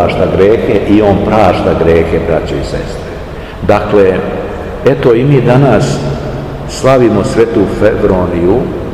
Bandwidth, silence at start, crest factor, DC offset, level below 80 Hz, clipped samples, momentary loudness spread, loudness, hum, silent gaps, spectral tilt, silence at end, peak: 13 kHz; 0 s; 10 dB; 0.9%; -26 dBFS; 3%; 12 LU; -10 LUFS; none; none; -7 dB/octave; 0 s; 0 dBFS